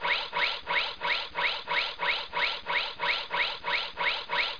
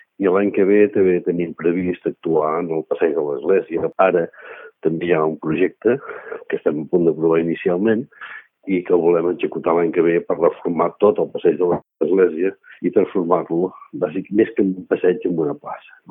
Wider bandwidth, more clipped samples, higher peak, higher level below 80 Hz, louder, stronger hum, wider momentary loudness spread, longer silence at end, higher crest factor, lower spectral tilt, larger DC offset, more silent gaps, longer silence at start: first, 5.4 kHz vs 3.7 kHz; neither; second, -16 dBFS vs 0 dBFS; about the same, -58 dBFS vs -62 dBFS; second, -28 LUFS vs -19 LUFS; neither; second, 2 LU vs 9 LU; second, 0 s vs 0.3 s; about the same, 16 dB vs 18 dB; second, -2 dB/octave vs -12 dB/octave; first, 0.4% vs under 0.1%; neither; second, 0 s vs 0.2 s